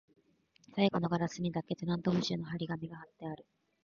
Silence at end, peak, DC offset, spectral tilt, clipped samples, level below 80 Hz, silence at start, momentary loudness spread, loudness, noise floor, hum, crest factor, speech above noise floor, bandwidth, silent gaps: 0.45 s; -16 dBFS; under 0.1%; -6.5 dB/octave; under 0.1%; -66 dBFS; 0.75 s; 14 LU; -35 LUFS; -69 dBFS; none; 20 dB; 35 dB; 7.2 kHz; none